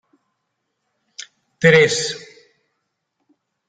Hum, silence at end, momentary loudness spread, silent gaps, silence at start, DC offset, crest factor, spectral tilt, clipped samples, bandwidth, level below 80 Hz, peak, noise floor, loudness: none; 1.5 s; 25 LU; none; 1.6 s; under 0.1%; 22 dB; -4 dB/octave; under 0.1%; 9.6 kHz; -60 dBFS; -2 dBFS; -75 dBFS; -15 LUFS